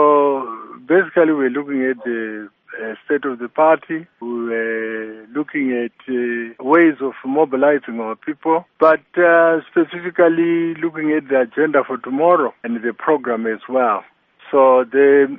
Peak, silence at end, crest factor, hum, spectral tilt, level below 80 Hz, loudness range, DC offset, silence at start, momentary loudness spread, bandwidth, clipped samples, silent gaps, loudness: 0 dBFS; 0 s; 16 dB; none; -4.5 dB/octave; -68 dBFS; 5 LU; under 0.1%; 0 s; 13 LU; 3.8 kHz; under 0.1%; none; -17 LUFS